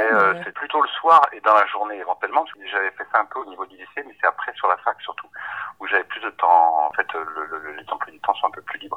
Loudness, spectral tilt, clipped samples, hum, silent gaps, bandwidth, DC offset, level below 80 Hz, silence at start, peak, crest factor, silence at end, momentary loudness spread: -21 LUFS; -4.5 dB/octave; under 0.1%; none; none; 8.2 kHz; under 0.1%; -74 dBFS; 0 s; -2 dBFS; 18 dB; 0 s; 16 LU